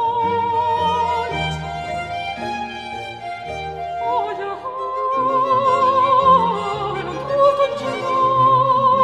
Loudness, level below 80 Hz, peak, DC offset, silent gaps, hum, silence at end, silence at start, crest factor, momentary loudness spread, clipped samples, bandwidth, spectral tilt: -19 LUFS; -46 dBFS; -4 dBFS; under 0.1%; none; none; 0 s; 0 s; 16 dB; 13 LU; under 0.1%; 10.5 kHz; -5.5 dB/octave